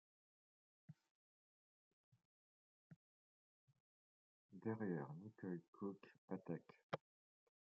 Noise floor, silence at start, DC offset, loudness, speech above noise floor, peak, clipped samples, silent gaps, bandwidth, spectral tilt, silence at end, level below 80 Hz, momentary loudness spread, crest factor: under -90 dBFS; 0.9 s; under 0.1%; -51 LUFS; over 40 dB; -30 dBFS; under 0.1%; 1.11-2.12 s, 2.25-2.90 s, 2.96-3.67 s, 3.80-4.49 s, 5.68-5.73 s, 6.18-6.28 s, 6.83-6.90 s; 6.2 kHz; -7 dB/octave; 0.65 s; under -90 dBFS; 19 LU; 26 dB